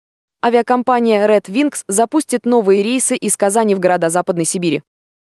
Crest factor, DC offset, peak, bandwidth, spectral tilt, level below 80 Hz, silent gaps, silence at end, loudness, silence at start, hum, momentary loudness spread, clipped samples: 14 dB; under 0.1%; -2 dBFS; 12.5 kHz; -4 dB/octave; -66 dBFS; none; 0.55 s; -15 LUFS; 0.45 s; none; 5 LU; under 0.1%